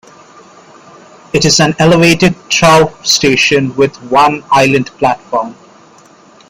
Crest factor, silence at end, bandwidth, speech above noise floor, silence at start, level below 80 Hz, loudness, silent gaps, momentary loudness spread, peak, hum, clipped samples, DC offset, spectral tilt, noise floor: 12 dB; 0.95 s; 16.5 kHz; 32 dB; 1.35 s; -42 dBFS; -10 LUFS; none; 8 LU; 0 dBFS; none; under 0.1%; under 0.1%; -4 dB/octave; -42 dBFS